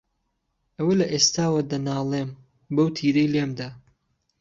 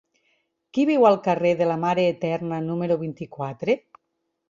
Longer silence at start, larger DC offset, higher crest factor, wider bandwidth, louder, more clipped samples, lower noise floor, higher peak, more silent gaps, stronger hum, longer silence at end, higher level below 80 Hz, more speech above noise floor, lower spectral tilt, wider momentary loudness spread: about the same, 0.8 s vs 0.75 s; neither; about the same, 20 dB vs 20 dB; about the same, 7.8 kHz vs 7.4 kHz; about the same, -23 LUFS vs -23 LUFS; neither; about the same, -75 dBFS vs -77 dBFS; about the same, -6 dBFS vs -4 dBFS; neither; neither; about the same, 0.6 s vs 0.7 s; about the same, -62 dBFS vs -66 dBFS; about the same, 52 dB vs 55 dB; second, -4.5 dB/octave vs -7.5 dB/octave; about the same, 11 LU vs 12 LU